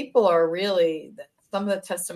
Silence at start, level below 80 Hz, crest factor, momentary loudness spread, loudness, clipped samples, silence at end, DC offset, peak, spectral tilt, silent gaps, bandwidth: 0 s; -74 dBFS; 16 dB; 13 LU; -23 LUFS; under 0.1%; 0 s; under 0.1%; -8 dBFS; -4 dB/octave; none; 13.5 kHz